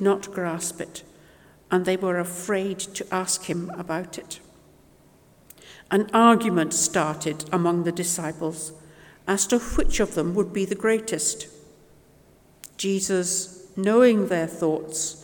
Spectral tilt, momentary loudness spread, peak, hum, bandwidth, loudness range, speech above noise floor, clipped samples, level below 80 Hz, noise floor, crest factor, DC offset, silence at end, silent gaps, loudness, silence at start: -4 dB/octave; 16 LU; -4 dBFS; none; 19 kHz; 6 LU; 32 dB; under 0.1%; -40 dBFS; -55 dBFS; 20 dB; under 0.1%; 0 s; none; -24 LUFS; 0 s